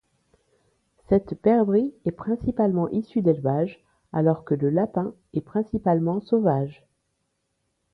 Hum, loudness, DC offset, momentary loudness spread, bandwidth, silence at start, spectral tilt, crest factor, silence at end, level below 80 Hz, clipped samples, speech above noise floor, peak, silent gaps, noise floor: none; -24 LUFS; under 0.1%; 8 LU; 4.9 kHz; 1.1 s; -11.5 dB/octave; 18 dB; 1.2 s; -54 dBFS; under 0.1%; 52 dB; -8 dBFS; none; -75 dBFS